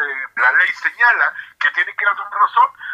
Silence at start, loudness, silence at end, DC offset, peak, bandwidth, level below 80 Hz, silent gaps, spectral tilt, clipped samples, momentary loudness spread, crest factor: 0 s; -16 LUFS; 0 s; under 0.1%; -2 dBFS; 9.6 kHz; -72 dBFS; none; 0 dB/octave; under 0.1%; 6 LU; 16 dB